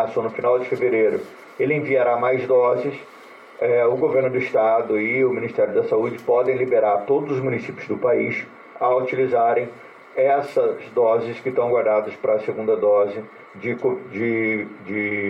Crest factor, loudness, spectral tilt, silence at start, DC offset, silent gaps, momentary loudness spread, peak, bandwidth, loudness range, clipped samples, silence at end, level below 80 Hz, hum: 12 dB; -21 LUFS; -8 dB/octave; 0 s; under 0.1%; none; 9 LU; -8 dBFS; 6.8 kHz; 2 LU; under 0.1%; 0 s; -68 dBFS; none